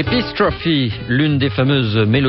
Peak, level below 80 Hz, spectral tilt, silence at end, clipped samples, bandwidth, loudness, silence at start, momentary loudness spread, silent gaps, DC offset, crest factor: -4 dBFS; -36 dBFS; -9.5 dB/octave; 0 s; under 0.1%; 5.8 kHz; -16 LUFS; 0 s; 3 LU; none; under 0.1%; 12 dB